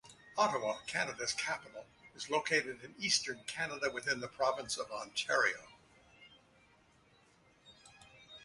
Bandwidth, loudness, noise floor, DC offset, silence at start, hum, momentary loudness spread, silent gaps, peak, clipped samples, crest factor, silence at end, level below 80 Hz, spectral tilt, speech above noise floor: 11.5 kHz; -35 LUFS; -67 dBFS; under 0.1%; 0.05 s; none; 14 LU; none; -16 dBFS; under 0.1%; 22 dB; 0 s; -74 dBFS; -1.5 dB/octave; 31 dB